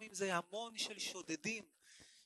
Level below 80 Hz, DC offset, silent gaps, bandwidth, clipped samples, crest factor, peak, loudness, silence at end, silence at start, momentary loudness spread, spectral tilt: -86 dBFS; under 0.1%; none; 12 kHz; under 0.1%; 22 dB; -22 dBFS; -42 LUFS; 0 s; 0 s; 21 LU; -2.5 dB/octave